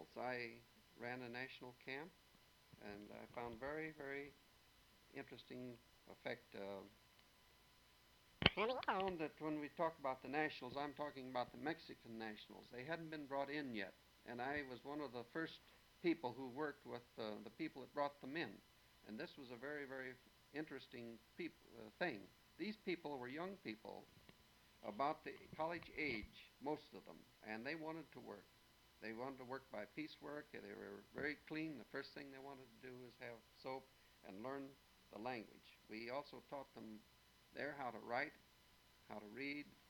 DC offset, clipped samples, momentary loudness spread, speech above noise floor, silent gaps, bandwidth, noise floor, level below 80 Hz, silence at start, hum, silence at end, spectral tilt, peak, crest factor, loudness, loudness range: under 0.1%; under 0.1%; 16 LU; 22 dB; none; 19.5 kHz; -71 dBFS; -76 dBFS; 0 s; none; 0 s; -5.5 dB/octave; -14 dBFS; 36 dB; -49 LUFS; 9 LU